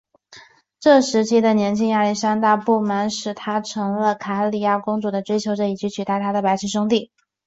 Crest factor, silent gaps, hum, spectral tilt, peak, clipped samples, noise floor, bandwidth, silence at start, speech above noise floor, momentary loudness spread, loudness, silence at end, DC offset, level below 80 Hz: 16 dB; none; none; -5 dB/octave; -2 dBFS; under 0.1%; -48 dBFS; 8 kHz; 0.3 s; 28 dB; 8 LU; -20 LUFS; 0.4 s; under 0.1%; -64 dBFS